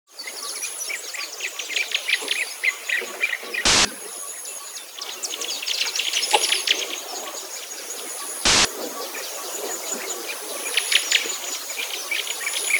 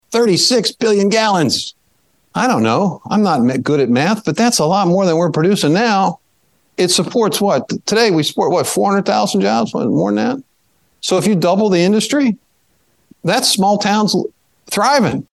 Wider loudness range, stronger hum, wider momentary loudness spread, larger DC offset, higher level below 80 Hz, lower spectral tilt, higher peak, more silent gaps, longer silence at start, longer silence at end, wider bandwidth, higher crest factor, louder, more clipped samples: about the same, 2 LU vs 2 LU; neither; first, 13 LU vs 6 LU; neither; first, -52 dBFS vs -58 dBFS; second, 0.5 dB/octave vs -4.5 dB/octave; about the same, 0 dBFS vs 0 dBFS; neither; about the same, 0.1 s vs 0.1 s; about the same, 0 s vs 0.1 s; first, over 20 kHz vs 12.5 kHz; first, 26 dB vs 14 dB; second, -23 LUFS vs -14 LUFS; neither